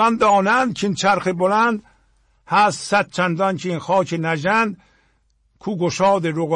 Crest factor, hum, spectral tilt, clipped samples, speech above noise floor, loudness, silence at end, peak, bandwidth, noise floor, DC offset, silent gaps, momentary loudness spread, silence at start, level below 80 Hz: 14 dB; none; -5 dB/octave; under 0.1%; 44 dB; -19 LUFS; 0 s; -6 dBFS; 11 kHz; -62 dBFS; under 0.1%; none; 8 LU; 0 s; -58 dBFS